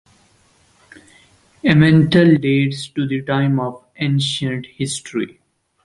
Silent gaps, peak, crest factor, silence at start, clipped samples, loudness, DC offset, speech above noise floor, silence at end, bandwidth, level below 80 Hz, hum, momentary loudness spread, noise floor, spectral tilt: none; -2 dBFS; 18 dB; 1.65 s; under 0.1%; -17 LUFS; under 0.1%; 40 dB; 0.55 s; 11.5 kHz; -50 dBFS; none; 13 LU; -56 dBFS; -6 dB/octave